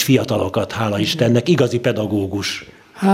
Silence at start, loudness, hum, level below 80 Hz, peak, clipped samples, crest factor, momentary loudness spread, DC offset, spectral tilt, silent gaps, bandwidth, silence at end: 0 s; -18 LUFS; none; -56 dBFS; 0 dBFS; under 0.1%; 16 dB; 7 LU; under 0.1%; -5.5 dB/octave; none; 16 kHz; 0 s